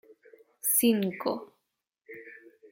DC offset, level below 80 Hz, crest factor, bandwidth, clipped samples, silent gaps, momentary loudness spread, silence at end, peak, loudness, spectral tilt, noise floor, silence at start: under 0.1%; -78 dBFS; 20 dB; 17 kHz; under 0.1%; none; 25 LU; 0.35 s; -12 dBFS; -27 LUFS; -3.5 dB/octave; -82 dBFS; 0.65 s